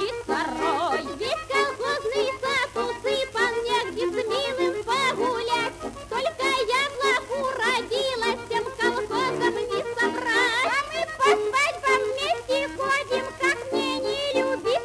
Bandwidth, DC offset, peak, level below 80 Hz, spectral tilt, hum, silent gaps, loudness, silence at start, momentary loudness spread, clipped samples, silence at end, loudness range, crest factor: 11 kHz; under 0.1%; -8 dBFS; -54 dBFS; -2.5 dB/octave; none; none; -24 LUFS; 0 s; 6 LU; under 0.1%; 0 s; 2 LU; 18 dB